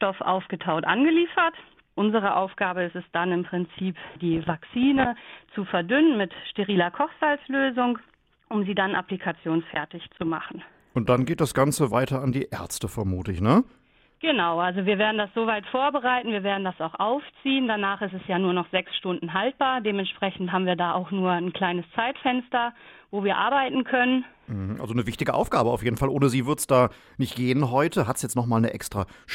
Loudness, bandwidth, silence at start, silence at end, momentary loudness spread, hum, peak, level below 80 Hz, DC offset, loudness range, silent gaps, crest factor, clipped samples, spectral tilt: -25 LUFS; 16 kHz; 0 s; 0 s; 10 LU; none; -4 dBFS; -54 dBFS; under 0.1%; 3 LU; none; 20 dB; under 0.1%; -5.5 dB/octave